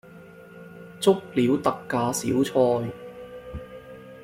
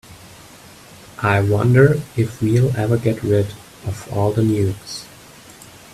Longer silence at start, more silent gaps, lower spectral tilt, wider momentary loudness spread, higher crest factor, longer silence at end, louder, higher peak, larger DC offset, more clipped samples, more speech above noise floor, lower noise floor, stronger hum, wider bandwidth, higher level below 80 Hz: about the same, 0.15 s vs 0.1 s; neither; second, -5.5 dB/octave vs -7 dB/octave; first, 22 LU vs 17 LU; about the same, 20 dB vs 18 dB; second, 0 s vs 0.85 s; second, -24 LUFS vs -18 LUFS; second, -6 dBFS vs 0 dBFS; neither; neither; about the same, 23 dB vs 26 dB; first, -46 dBFS vs -42 dBFS; neither; first, 16.5 kHz vs 14 kHz; second, -54 dBFS vs -48 dBFS